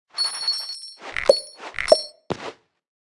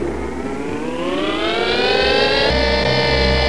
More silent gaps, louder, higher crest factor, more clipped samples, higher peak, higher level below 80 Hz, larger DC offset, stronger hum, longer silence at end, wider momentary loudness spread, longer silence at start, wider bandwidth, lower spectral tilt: neither; second, -23 LUFS vs -17 LUFS; first, 24 dB vs 14 dB; neither; first, 0 dBFS vs -4 dBFS; second, -54 dBFS vs -28 dBFS; second, under 0.1% vs 2%; neither; first, 0.5 s vs 0 s; first, 14 LU vs 10 LU; first, 0.15 s vs 0 s; about the same, 12 kHz vs 11 kHz; second, -1.5 dB/octave vs -5 dB/octave